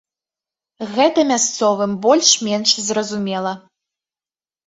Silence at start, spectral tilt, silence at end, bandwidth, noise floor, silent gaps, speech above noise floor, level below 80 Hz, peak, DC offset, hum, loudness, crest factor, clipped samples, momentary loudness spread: 0.8 s; -2.5 dB/octave; 1.1 s; 8.2 kHz; under -90 dBFS; none; over 73 dB; -64 dBFS; 0 dBFS; under 0.1%; none; -16 LUFS; 20 dB; under 0.1%; 12 LU